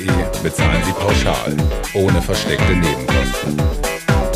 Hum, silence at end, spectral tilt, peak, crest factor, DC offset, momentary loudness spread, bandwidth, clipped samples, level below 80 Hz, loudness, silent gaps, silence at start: none; 0 s; -5 dB/octave; -2 dBFS; 14 dB; under 0.1%; 4 LU; 16 kHz; under 0.1%; -24 dBFS; -17 LUFS; none; 0 s